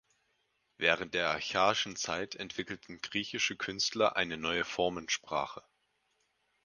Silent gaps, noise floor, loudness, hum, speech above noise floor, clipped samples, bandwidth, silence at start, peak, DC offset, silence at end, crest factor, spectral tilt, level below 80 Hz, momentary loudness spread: none; -77 dBFS; -33 LUFS; none; 44 dB; under 0.1%; 10.5 kHz; 0.8 s; -8 dBFS; under 0.1%; 1.05 s; 26 dB; -2 dB/octave; -66 dBFS; 10 LU